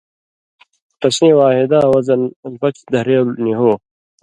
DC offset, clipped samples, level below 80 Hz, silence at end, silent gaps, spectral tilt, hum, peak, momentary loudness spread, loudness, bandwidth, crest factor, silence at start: under 0.1%; under 0.1%; -56 dBFS; 0.45 s; 2.36-2.43 s; -6 dB/octave; none; 0 dBFS; 10 LU; -14 LUFS; 11.5 kHz; 14 dB; 1 s